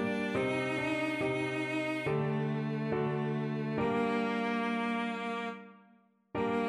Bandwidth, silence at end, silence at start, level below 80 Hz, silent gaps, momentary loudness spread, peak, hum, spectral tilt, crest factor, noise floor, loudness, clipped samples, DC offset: 12 kHz; 0 s; 0 s; -66 dBFS; none; 5 LU; -20 dBFS; none; -7 dB/octave; 14 dB; -65 dBFS; -33 LUFS; under 0.1%; under 0.1%